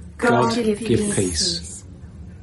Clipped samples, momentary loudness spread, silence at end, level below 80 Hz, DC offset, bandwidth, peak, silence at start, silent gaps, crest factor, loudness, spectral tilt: under 0.1%; 22 LU; 0 s; -42 dBFS; under 0.1%; 11.5 kHz; -4 dBFS; 0 s; none; 16 dB; -20 LUFS; -4 dB/octave